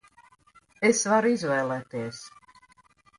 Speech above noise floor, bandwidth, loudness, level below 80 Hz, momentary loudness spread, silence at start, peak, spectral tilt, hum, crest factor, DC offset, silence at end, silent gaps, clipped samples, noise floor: 35 dB; 11.5 kHz; -25 LUFS; -70 dBFS; 17 LU; 0.8 s; -8 dBFS; -4 dB/octave; none; 20 dB; under 0.1%; 0.9 s; none; under 0.1%; -61 dBFS